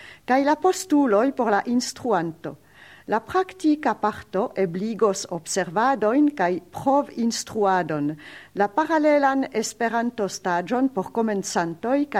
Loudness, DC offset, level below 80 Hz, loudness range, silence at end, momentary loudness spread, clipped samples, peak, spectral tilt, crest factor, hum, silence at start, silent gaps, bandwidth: -23 LUFS; under 0.1%; -64 dBFS; 2 LU; 0 s; 8 LU; under 0.1%; -6 dBFS; -4.5 dB/octave; 18 dB; none; 0 s; none; 15.5 kHz